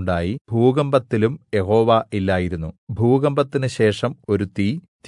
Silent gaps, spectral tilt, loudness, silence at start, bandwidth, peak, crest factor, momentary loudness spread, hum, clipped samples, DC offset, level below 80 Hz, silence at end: 0.41-0.45 s, 2.78-2.87 s, 4.88-4.99 s; -7.5 dB/octave; -20 LUFS; 0 s; 11 kHz; -4 dBFS; 16 dB; 7 LU; none; under 0.1%; under 0.1%; -52 dBFS; 0 s